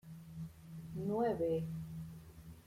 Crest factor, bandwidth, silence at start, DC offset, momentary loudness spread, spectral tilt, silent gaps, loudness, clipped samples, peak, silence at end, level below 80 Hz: 16 dB; 16 kHz; 0.05 s; under 0.1%; 17 LU; -8.5 dB/octave; none; -40 LUFS; under 0.1%; -24 dBFS; 0 s; -64 dBFS